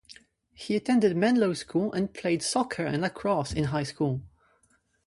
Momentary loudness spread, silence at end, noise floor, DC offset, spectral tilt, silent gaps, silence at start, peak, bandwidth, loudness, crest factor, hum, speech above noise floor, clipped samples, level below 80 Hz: 7 LU; 0.8 s; -68 dBFS; under 0.1%; -5.5 dB/octave; none; 0.1 s; -12 dBFS; 11.5 kHz; -27 LUFS; 16 dB; none; 42 dB; under 0.1%; -54 dBFS